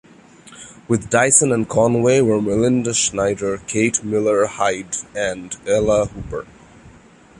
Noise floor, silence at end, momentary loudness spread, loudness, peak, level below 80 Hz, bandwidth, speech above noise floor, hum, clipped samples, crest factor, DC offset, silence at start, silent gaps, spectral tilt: -46 dBFS; 0.5 s; 15 LU; -18 LUFS; 0 dBFS; -44 dBFS; 11.5 kHz; 28 dB; none; under 0.1%; 18 dB; under 0.1%; 0.5 s; none; -4 dB/octave